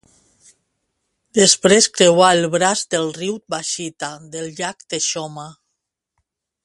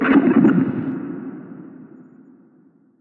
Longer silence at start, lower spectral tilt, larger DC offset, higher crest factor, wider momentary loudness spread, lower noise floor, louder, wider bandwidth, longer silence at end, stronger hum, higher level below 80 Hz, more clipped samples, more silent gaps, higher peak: first, 1.35 s vs 0 s; second, -2.5 dB/octave vs -10 dB/octave; neither; about the same, 20 dB vs 18 dB; second, 17 LU vs 24 LU; first, -77 dBFS vs -54 dBFS; about the same, -16 LUFS vs -18 LUFS; first, 11.5 kHz vs 3.9 kHz; about the same, 1.15 s vs 1.2 s; neither; about the same, -60 dBFS vs -60 dBFS; neither; neither; about the same, 0 dBFS vs -2 dBFS